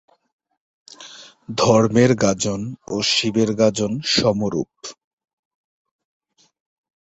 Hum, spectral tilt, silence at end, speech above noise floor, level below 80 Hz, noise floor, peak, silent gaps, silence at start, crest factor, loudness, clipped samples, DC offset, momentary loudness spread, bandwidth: none; -4.5 dB/octave; 2.1 s; 24 dB; -52 dBFS; -42 dBFS; -2 dBFS; none; 1 s; 20 dB; -19 LUFS; under 0.1%; under 0.1%; 22 LU; 8.2 kHz